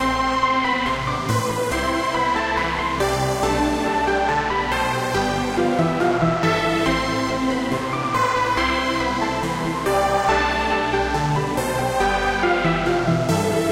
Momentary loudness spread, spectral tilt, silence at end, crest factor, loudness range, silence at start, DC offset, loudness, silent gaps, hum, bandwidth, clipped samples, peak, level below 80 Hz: 3 LU; -5 dB/octave; 0 s; 14 dB; 1 LU; 0 s; under 0.1%; -20 LUFS; none; none; 16 kHz; under 0.1%; -8 dBFS; -36 dBFS